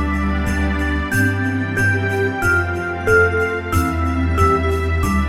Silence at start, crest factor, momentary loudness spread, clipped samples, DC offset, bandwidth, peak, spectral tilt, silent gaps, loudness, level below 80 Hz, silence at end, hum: 0 s; 16 dB; 5 LU; under 0.1%; under 0.1%; 15.5 kHz; -2 dBFS; -6.5 dB/octave; none; -18 LUFS; -26 dBFS; 0 s; none